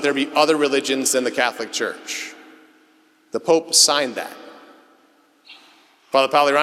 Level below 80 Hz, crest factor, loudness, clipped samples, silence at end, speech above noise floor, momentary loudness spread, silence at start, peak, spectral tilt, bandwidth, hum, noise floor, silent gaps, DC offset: -76 dBFS; 20 dB; -18 LUFS; under 0.1%; 0 s; 38 dB; 17 LU; 0 s; -2 dBFS; -1 dB/octave; 16 kHz; none; -57 dBFS; none; under 0.1%